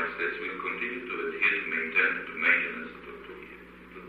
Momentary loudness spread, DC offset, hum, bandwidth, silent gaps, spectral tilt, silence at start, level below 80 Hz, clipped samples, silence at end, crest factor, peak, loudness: 20 LU; under 0.1%; 60 Hz at -55 dBFS; 13.5 kHz; none; -5 dB/octave; 0 s; -64 dBFS; under 0.1%; 0 s; 20 dB; -10 dBFS; -27 LUFS